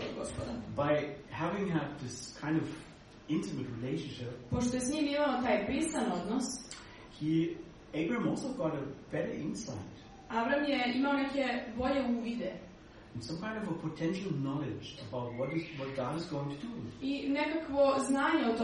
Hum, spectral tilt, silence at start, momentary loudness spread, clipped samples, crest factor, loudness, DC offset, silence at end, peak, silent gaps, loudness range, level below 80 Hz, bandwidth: none; -5.5 dB/octave; 0 s; 12 LU; under 0.1%; 18 dB; -35 LUFS; under 0.1%; 0 s; -18 dBFS; none; 4 LU; -58 dBFS; 11.5 kHz